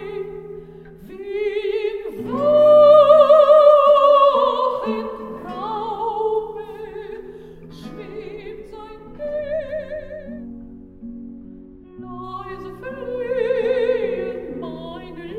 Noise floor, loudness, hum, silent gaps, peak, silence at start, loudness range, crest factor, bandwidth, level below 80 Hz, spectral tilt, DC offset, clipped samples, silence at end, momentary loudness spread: -41 dBFS; -16 LUFS; none; none; 0 dBFS; 0 s; 19 LU; 18 dB; 4.7 kHz; -48 dBFS; -6.5 dB/octave; under 0.1%; under 0.1%; 0 s; 26 LU